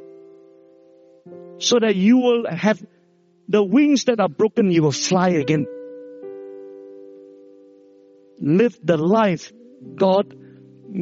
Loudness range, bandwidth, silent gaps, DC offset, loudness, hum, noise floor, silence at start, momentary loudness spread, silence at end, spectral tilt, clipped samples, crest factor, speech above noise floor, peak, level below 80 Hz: 7 LU; 7.6 kHz; none; under 0.1%; -19 LUFS; none; -58 dBFS; 1.25 s; 22 LU; 0 s; -5.5 dB/octave; under 0.1%; 16 dB; 40 dB; -4 dBFS; -66 dBFS